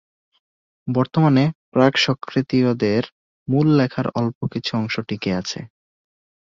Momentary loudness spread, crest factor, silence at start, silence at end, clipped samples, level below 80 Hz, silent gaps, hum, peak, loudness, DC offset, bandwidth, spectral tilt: 9 LU; 18 dB; 0.85 s; 0.85 s; under 0.1%; -56 dBFS; 1.55-1.72 s, 3.12-3.46 s, 4.35-4.41 s; none; -2 dBFS; -20 LUFS; under 0.1%; 7.6 kHz; -6.5 dB/octave